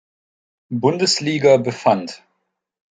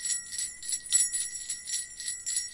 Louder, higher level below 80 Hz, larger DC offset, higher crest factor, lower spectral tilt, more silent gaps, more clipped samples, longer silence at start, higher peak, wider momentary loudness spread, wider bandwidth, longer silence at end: first, -17 LUFS vs -29 LUFS; about the same, -66 dBFS vs -66 dBFS; neither; about the same, 18 dB vs 22 dB; first, -4.5 dB/octave vs 3.5 dB/octave; neither; neither; first, 0.7 s vs 0 s; first, -2 dBFS vs -10 dBFS; about the same, 10 LU vs 9 LU; second, 9.6 kHz vs 11.5 kHz; first, 0.8 s vs 0 s